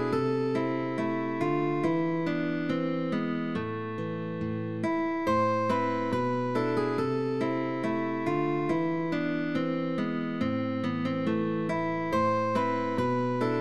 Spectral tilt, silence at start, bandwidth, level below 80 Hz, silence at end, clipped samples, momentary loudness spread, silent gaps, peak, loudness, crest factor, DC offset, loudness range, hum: -7.5 dB/octave; 0 s; 11.5 kHz; -62 dBFS; 0 s; under 0.1%; 4 LU; none; -14 dBFS; -29 LUFS; 14 dB; 0.3%; 2 LU; none